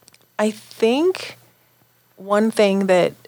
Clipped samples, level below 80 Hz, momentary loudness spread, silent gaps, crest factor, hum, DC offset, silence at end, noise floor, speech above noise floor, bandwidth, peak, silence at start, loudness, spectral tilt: under 0.1%; -76 dBFS; 17 LU; none; 16 dB; none; under 0.1%; 0.15 s; -58 dBFS; 40 dB; over 20 kHz; -4 dBFS; 0.4 s; -19 LUFS; -5.5 dB/octave